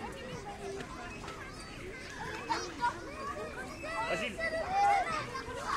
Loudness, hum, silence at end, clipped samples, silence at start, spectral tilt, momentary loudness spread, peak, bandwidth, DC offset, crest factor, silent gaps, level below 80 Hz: -36 LUFS; none; 0 s; under 0.1%; 0 s; -3.5 dB/octave; 14 LU; -18 dBFS; 15.5 kHz; under 0.1%; 18 dB; none; -54 dBFS